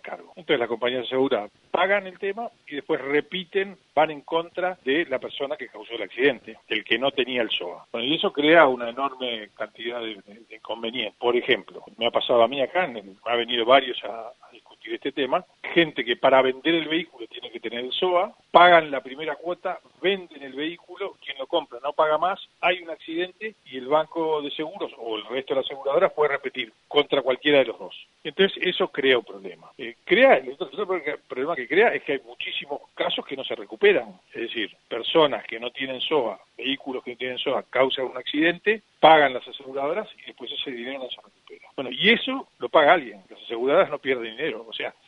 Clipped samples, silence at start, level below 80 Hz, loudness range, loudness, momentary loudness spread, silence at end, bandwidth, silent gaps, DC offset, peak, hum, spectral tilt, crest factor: under 0.1%; 0.05 s; -72 dBFS; 4 LU; -24 LUFS; 16 LU; 0.15 s; 7.8 kHz; none; under 0.1%; 0 dBFS; none; -6 dB/octave; 24 dB